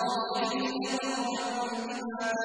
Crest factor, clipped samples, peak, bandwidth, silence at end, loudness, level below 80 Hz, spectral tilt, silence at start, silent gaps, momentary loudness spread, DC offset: 14 dB; under 0.1%; -18 dBFS; 10.5 kHz; 0 s; -31 LUFS; -74 dBFS; -3 dB/octave; 0 s; none; 4 LU; under 0.1%